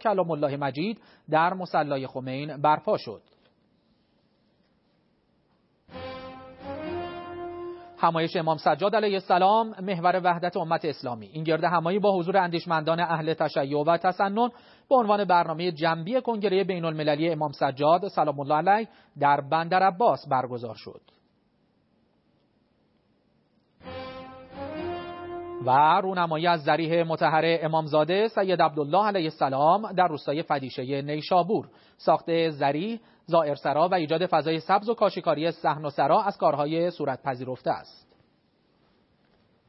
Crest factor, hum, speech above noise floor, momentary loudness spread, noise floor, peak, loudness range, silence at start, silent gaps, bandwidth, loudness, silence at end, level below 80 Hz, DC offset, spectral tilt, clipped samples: 18 dB; none; 43 dB; 15 LU; -68 dBFS; -8 dBFS; 9 LU; 0 s; none; 5.8 kHz; -25 LUFS; 1.8 s; -70 dBFS; under 0.1%; -10 dB/octave; under 0.1%